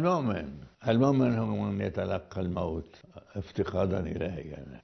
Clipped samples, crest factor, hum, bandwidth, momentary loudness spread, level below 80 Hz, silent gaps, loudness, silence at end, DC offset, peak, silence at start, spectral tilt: under 0.1%; 18 dB; none; 6.4 kHz; 16 LU; -52 dBFS; none; -30 LUFS; 0.05 s; under 0.1%; -12 dBFS; 0 s; -8.5 dB/octave